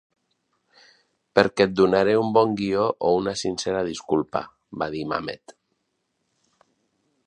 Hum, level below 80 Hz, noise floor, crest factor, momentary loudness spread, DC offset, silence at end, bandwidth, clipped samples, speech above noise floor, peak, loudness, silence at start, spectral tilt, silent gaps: none; -58 dBFS; -75 dBFS; 24 dB; 12 LU; under 0.1%; 1.75 s; 10.5 kHz; under 0.1%; 53 dB; 0 dBFS; -23 LUFS; 1.35 s; -5 dB/octave; none